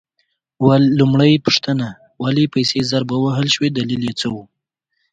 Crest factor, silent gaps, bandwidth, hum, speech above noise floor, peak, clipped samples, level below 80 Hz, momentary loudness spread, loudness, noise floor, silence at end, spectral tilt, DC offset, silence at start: 16 dB; none; 9.2 kHz; none; 57 dB; 0 dBFS; under 0.1%; -54 dBFS; 10 LU; -16 LUFS; -73 dBFS; 0.7 s; -6 dB/octave; under 0.1%; 0.6 s